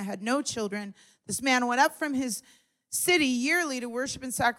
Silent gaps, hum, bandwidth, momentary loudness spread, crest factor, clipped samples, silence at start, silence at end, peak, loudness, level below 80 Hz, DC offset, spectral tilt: none; none; 17 kHz; 11 LU; 18 dB; under 0.1%; 0 s; 0.05 s; -10 dBFS; -27 LUFS; -66 dBFS; under 0.1%; -2.5 dB/octave